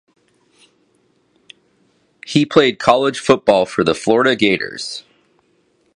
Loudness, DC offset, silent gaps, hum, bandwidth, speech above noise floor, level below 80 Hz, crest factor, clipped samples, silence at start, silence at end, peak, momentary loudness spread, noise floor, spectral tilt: -15 LUFS; under 0.1%; none; none; 11 kHz; 45 dB; -56 dBFS; 18 dB; under 0.1%; 2.25 s; 0.95 s; 0 dBFS; 13 LU; -60 dBFS; -5 dB/octave